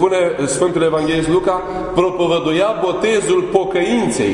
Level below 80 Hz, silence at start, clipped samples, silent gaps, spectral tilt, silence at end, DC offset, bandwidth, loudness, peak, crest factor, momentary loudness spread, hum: -42 dBFS; 0 s; under 0.1%; none; -5 dB/octave; 0 s; under 0.1%; 11 kHz; -16 LUFS; 0 dBFS; 16 dB; 2 LU; none